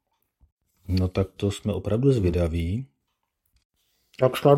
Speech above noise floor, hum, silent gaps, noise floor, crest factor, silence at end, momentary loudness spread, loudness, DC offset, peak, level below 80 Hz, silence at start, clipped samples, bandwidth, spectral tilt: 55 dB; none; 3.65-3.70 s; -78 dBFS; 22 dB; 0 s; 10 LU; -25 LUFS; under 0.1%; -4 dBFS; -46 dBFS; 0.9 s; under 0.1%; 16 kHz; -7.5 dB/octave